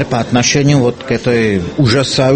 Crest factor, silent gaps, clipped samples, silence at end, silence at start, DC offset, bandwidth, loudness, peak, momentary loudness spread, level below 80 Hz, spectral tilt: 12 dB; none; under 0.1%; 0 s; 0 s; under 0.1%; 8.8 kHz; -12 LUFS; 0 dBFS; 5 LU; -40 dBFS; -5 dB/octave